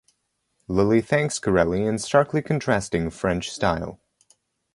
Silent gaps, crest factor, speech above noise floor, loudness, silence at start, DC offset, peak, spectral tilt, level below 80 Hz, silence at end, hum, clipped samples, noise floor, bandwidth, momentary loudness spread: none; 20 dB; 51 dB; -23 LUFS; 0.7 s; under 0.1%; -4 dBFS; -5.5 dB/octave; -46 dBFS; 0.8 s; none; under 0.1%; -73 dBFS; 11.5 kHz; 6 LU